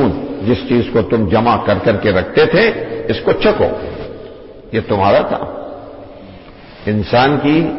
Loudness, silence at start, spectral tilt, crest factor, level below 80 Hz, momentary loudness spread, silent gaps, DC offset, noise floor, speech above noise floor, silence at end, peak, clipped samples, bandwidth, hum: -14 LUFS; 0 s; -10.5 dB/octave; 14 dB; -38 dBFS; 18 LU; none; under 0.1%; -36 dBFS; 23 dB; 0 s; -2 dBFS; under 0.1%; 5.8 kHz; none